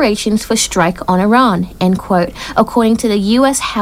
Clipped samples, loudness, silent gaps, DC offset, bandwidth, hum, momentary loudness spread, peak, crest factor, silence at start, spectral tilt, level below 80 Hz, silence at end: under 0.1%; -13 LUFS; none; under 0.1%; 16 kHz; none; 5 LU; 0 dBFS; 12 dB; 0 s; -4.5 dB/octave; -36 dBFS; 0 s